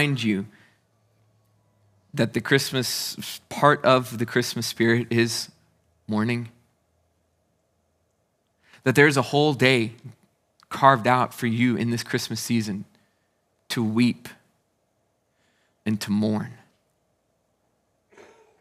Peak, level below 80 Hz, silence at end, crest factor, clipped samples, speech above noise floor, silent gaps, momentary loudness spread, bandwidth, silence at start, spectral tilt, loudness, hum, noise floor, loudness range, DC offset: 0 dBFS; -74 dBFS; 2.05 s; 24 dB; under 0.1%; 49 dB; none; 15 LU; 16 kHz; 0 s; -5 dB/octave; -23 LUFS; none; -71 dBFS; 10 LU; under 0.1%